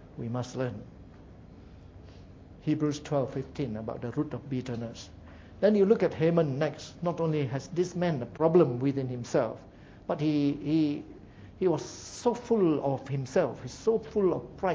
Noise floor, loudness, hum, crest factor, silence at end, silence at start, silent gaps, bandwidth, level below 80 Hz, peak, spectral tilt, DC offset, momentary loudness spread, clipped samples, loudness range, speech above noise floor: -50 dBFS; -29 LUFS; none; 20 dB; 0 s; 0 s; none; 8 kHz; -56 dBFS; -10 dBFS; -7 dB/octave; under 0.1%; 13 LU; under 0.1%; 7 LU; 21 dB